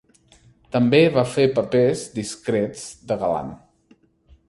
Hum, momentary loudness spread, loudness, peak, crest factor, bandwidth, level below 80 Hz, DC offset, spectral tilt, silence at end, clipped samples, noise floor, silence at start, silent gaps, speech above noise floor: none; 13 LU; -21 LUFS; -4 dBFS; 18 dB; 11.5 kHz; -54 dBFS; under 0.1%; -6 dB/octave; 0.95 s; under 0.1%; -58 dBFS; 0.75 s; none; 38 dB